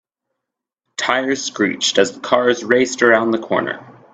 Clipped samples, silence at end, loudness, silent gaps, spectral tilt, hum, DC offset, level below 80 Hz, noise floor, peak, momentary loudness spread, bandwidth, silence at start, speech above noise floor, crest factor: under 0.1%; 0.2 s; -17 LUFS; none; -3 dB/octave; none; under 0.1%; -62 dBFS; -82 dBFS; 0 dBFS; 9 LU; 9 kHz; 1 s; 65 dB; 18 dB